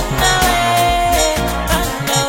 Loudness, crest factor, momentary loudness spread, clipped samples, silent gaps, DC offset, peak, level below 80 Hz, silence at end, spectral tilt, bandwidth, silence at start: -14 LUFS; 14 dB; 4 LU; under 0.1%; none; under 0.1%; 0 dBFS; -24 dBFS; 0 s; -3 dB/octave; 16.5 kHz; 0 s